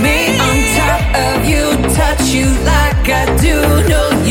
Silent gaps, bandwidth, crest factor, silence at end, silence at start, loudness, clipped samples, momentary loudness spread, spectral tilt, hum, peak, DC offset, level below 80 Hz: none; 17 kHz; 12 dB; 0 s; 0 s; -12 LUFS; under 0.1%; 2 LU; -4.5 dB/octave; none; 0 dBFS; under 0.1%; -16 dBFS